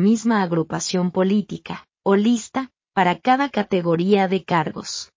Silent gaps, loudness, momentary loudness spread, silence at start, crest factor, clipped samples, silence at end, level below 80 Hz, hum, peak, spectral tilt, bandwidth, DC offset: none; -20 LUFS; 11 LU; 0 s; 16 dB; under 0.1%; 0.1 s; -62 dBFS; none; -4 dBFS; -5.5 dB/octave; 7.6 kHz; under 0.1%